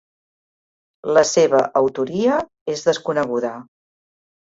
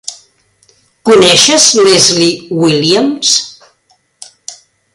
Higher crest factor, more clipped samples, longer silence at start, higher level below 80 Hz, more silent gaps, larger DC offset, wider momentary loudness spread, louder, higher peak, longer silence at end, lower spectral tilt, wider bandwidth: first, 18 dB vs 12 dB; second, under 0.1% vs 0.2%; first, 1.05 s vs 0.05 s; second, -62 dBFS vs -52 dBFS; first, 2.61-2.66 s vs none; neither; second, 12 LU vs 23 LU; second, -19 LUFS vs -7 LUFS; about the same, -2 dBFS vs 0 dBFS; first, 0.9 s vs 0.4 s; first, -4 dB/octave vs -2.5 dB/octave; second, 7.8 kHz vs 16 kHz